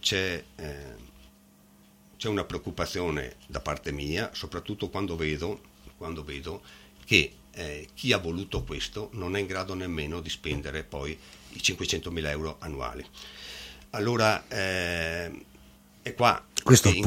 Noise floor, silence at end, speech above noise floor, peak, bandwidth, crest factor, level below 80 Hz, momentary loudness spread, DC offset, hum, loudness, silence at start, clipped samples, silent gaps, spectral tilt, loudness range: -58 dBFS; 0 s; 29 dB; -2 dBFS; 16.5 kHz; 28 dB; -46 dBFS; 17 LU; under 0.1%; none; -29 LUFS; 0.05 s; under 0.1%; none; -4 dB/octave; 5 LU